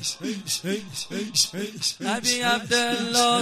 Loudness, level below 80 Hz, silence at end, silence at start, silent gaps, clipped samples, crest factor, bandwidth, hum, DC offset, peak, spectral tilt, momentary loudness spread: -24 LUFS; -64 dBFS; 0 s; 0 s; none; under 0.1%; 18 dB; 15.5 kHz; none; under 0.1%; -6 dBFS; -2 dB/octave; 9 LU